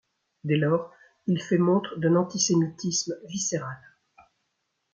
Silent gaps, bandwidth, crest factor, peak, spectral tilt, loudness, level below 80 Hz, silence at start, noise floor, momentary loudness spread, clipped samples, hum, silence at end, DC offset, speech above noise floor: none; 9.6 kHz; 16 dB; -10 dBFS; -5 dB/octave; -26 LUFS; -70 dBFS; 0.45 s; -78 dBFS; 14 LU; under 0.1%; none; 1.15 s; under 0.1%; 53 dB